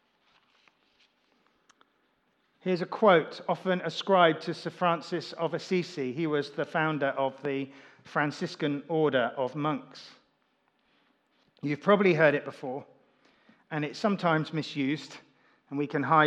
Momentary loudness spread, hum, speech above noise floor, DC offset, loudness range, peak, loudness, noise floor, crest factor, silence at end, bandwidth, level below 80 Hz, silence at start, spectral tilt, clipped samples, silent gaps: 15 LU; none; 44 dB; under 0.1%; 5 LU; -8 dBFS; -29 LUFS; -72 dBFS; 22 dB; 0 s; 9.8 kHz; -88 dBFS; 2.65 s; -6.5 dB/octave; under 0.1%; none